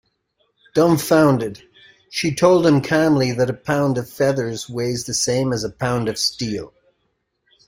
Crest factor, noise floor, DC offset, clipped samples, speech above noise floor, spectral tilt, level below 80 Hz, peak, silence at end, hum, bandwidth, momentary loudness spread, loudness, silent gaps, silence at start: 18 dB; -70 dBFS; under 0.1%; under 0.1%; 52 dB; -5 dB/octave; -52 dBFS; -2 dBFS; 1 s; none; 16 kHz; 10 LU; -19 LUFS; none; 0.75 s